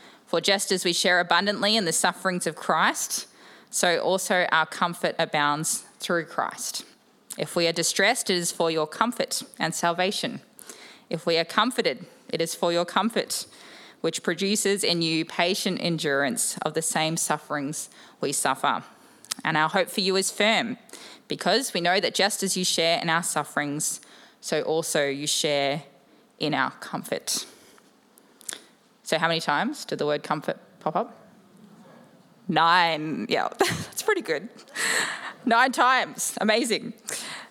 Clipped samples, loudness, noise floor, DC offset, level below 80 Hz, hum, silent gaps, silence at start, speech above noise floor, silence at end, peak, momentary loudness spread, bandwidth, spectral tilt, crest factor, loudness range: under 0.1%; -25 LUFS; -57 dBFS; under 0.1%; -76 dBFS; none; none; 0.05 s; 32 dB; 0.05 s; -2 dBFS; 12 LU; 17.5 kHz; -2.5 dB/octave; 24 dB; 5 LU